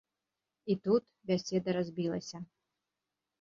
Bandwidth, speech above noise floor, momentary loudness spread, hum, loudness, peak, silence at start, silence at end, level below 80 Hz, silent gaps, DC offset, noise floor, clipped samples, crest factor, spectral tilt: 7.6 kHz; 56 dB; 16 LU; 50 Hz at -65 dBFS; -34 LUFS; -18 dBFS; 0.65 s; 0.95 s; -74 dBFS; none; under 0.1%; -89 dBFS; under 0.1%; 18 dB; -6.5 dB/octave